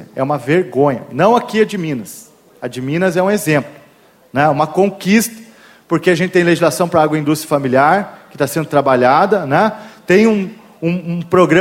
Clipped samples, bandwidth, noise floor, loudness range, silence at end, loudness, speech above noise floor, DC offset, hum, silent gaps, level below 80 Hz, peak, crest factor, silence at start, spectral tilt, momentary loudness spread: under 0.1%; 16.5 kHz; -48 dBFS; 3 LU; 0 s; -14 LUFS; 34 dB; under 0.1%; none; none; -56 dBFS; 0 dBFS; 14 dB; 0 s; -6 dB/octave; 11 LU